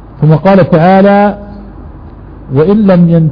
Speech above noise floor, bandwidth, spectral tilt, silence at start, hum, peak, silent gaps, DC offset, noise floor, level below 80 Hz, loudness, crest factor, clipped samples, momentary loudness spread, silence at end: 23 dB; 5.2 kHz; -11 dB/octave; 0.15 s; none; 0 dBFS; none; under 0.1%; -28 dBFS; -32 dBFS; -7 LUFS; 8 dB; 1%; 10 LU; 0 s